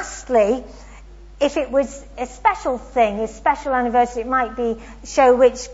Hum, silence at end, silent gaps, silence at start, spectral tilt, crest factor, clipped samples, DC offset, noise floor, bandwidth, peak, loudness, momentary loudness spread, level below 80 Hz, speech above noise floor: none; 0 s; none; 0 s; -4 dB/octave; 18 dB; under 0.1%; under 0.1%; -40 dBFS; 8 kHz; -2 dBFS; -19 LUFS; 10 LU; -42 dBFS; 22 dB